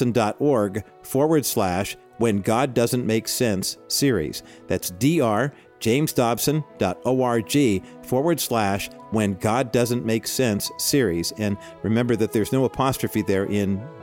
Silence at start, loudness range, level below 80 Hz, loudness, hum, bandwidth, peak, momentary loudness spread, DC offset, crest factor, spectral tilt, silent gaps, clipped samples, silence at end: 0 s; 1 LU; -52 dBFS; -23 LUFS; none; 17 kHz; -6 dBFS; 7 LU; under 0.1%; 16 dB; -5 dB/octave; none; under 0.1%; 0 s